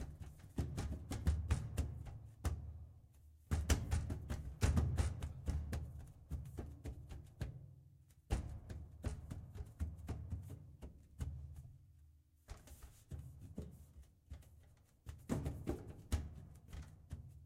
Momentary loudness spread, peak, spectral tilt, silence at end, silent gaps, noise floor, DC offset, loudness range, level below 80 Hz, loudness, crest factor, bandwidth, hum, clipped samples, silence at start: 20 LU; -20 dBFS; -6 dB/octave; 0 s; none; -67 dBFS; under 0.1%; 13 LU; -48 dBFS; -45 LUFS; 26 dB; 15.5 kHz; none; under 0.1%; 0 s